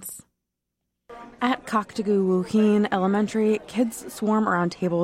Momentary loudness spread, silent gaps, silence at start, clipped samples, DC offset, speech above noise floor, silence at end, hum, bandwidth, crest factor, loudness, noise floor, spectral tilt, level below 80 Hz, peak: 8 LU; none; 0 s; under 0.1%; under 0.1%; 59 dB; 0 s; none; 14.5 kHz; 14 dB; -23 LUFS; -82 dBFS; -6 dB/octave; -62 dBFS; -10 dBFS